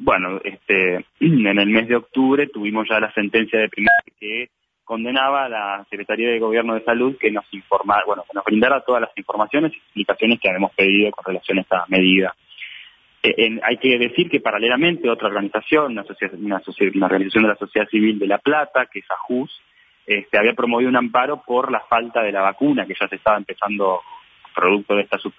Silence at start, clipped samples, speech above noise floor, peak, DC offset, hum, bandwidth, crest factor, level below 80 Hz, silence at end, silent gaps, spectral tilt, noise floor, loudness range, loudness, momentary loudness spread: 0 s; under 0.1%; 25 dB; -4 dBFS; under 0.1%; none; 5.2 kHz; 16 dB; -58 dBFS; 0.1 s; none; -8 dB/octave; -44 dBFS; 2 LU; -19 LUFS; 10 LU